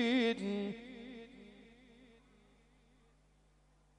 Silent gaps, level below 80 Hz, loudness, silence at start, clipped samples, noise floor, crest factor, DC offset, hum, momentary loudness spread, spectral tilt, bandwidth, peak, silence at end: none; -70 dBFS; -37 LUFS; 0 s; under 0.1%; -69 dBFS; 18 dB; under 0.1%; 50 Hz at -65 dBFS; 28 LU; -5.5 dB/octave; 9.8 kHz; -22 dBFS; 1.95 s